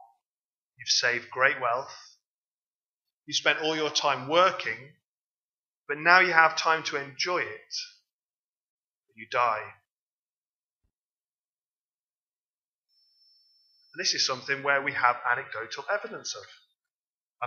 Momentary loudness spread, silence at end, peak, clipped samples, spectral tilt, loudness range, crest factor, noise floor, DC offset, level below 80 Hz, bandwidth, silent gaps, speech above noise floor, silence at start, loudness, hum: 16 LU; 0 s; -2 dBFS; under 0.1%; -1.5 dB/octave; 11 LU; 28 dB; under -90 dBFS; under 0.1%; -86 dBFS; 7.4 kHz; 2.26-3.00 s, 3.13-3.17 s, 5.05-5.85 s, 8.13-8.29 s, 8.36-9.00 s, 9.92-10.81 s, 10.95-12.82 s, 16.91-17.34 s; over 63 dB; 0.8 s; -26 LUFS; none